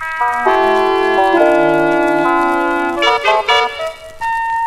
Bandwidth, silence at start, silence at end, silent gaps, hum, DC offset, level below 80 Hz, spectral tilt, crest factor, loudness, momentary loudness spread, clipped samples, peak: 14 kHz; 0 s; 0 s; none; none; under 0.1%; -44 dBFS; -4 dB/octave; 14 dB; -13 LUFS; 8 LU; under 0.1%; 0 dBFS